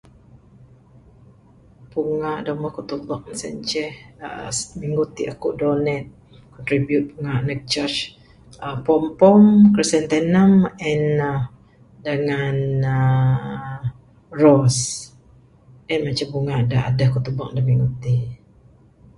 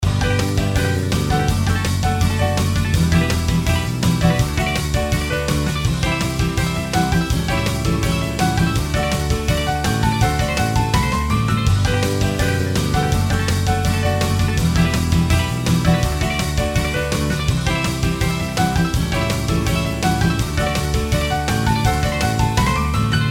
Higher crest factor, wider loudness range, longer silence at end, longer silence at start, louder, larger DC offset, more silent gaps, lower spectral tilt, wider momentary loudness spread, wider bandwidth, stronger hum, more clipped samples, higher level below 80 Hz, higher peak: first, 20 dB vs 14 dB; first, 11 LU vs 1 LU; first, 0.8 s vs 0 s; first, 1.95 s vs 0 s; about the same, -20 LUFS vs -19 LUFS; neither; neither; about the same, -6 dB/octave vs -5 dB/octave; first, 17 LU vs 3 LU; second, 11.5 kHz vs 17 kHz; neither; neither; second, -48 dBFS vs -26 dBFS; about the same, 0 dBFS vs -2 dBFS